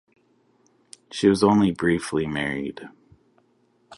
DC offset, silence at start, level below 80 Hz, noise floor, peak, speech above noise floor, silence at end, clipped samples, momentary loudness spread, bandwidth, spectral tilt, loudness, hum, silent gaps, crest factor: under 0.1%; 1.1 s; -54 dBFS; -64 dBFS; -4 dBFS; 42 dB; 0.05 s; under 0.1%; 16 LU; 11.5 kHz; -6 dB/octave; -22 LUFS; none; none; 20 dB